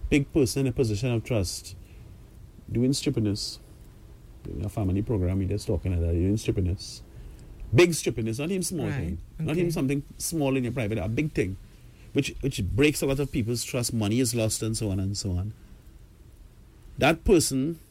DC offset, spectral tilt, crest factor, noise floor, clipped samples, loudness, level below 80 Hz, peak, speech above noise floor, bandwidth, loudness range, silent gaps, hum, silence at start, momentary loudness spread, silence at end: under 0.1%; -5.5 dB/octave; 18 dB; -50 dBFS; under 0.1%; -27 LUFS; -42 dBFS; -10 dBFS; 24 dB; 16.5 kHz; 3 LU; none; none; 0 s; 13 LU; 0.1 s